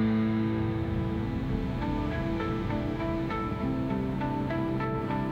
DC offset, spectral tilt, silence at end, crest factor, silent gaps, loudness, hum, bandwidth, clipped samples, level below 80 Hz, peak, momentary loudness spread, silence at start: under 0.1%; -9 dB/octave; 0 s; 12 dB; none; -30 LUFS; none; 8.2 kHz; under 0.1%; -42 dBFS; -16 dBFS; 3 LU; 0 s